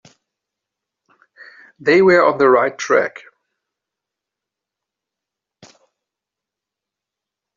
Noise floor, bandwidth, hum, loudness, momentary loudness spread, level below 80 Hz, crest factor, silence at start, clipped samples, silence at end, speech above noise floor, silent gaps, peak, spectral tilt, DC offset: -85 dBFS; 7.4 kHz; none; -14 LUFS; 9 LU; -66 dBFS; 20 dB; 1.8 s; under 0.1%; 4.45 s; 71 dB; none; -2 dBFS; -3.5 dB/octave; under 0.1%